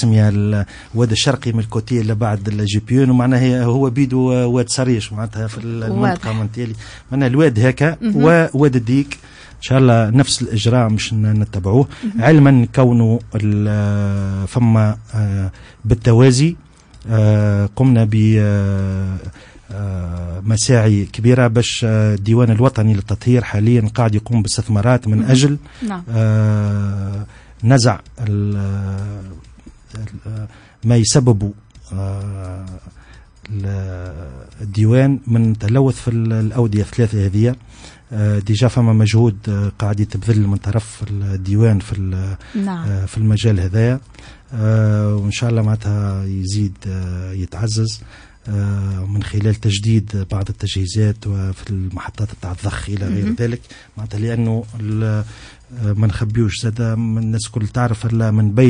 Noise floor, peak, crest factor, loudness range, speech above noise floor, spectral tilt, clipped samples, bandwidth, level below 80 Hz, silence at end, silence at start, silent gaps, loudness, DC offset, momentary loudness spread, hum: -42 dBFS; 0 dBFS; 14 dB; 7 LU; 27 dB; -6.5 dB/octave; under 0.1%; 10 kHz; -40 dBFS; 0 s; 0 s; none; -16 LUFS; under 0.1%; 13 LU; none